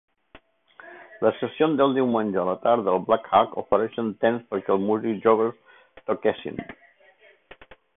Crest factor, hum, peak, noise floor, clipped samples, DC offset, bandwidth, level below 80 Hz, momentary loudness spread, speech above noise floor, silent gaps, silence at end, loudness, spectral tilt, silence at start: 20 dB; none; -4 dBFS; -56 dBFS; under 0.1%; under 0.1%; 3.9 kHz; -62 dBFS; 13 LU; 34 dB; none; 1.25 s; -23 LUFS; -10.5 dB/octave; 0.35 s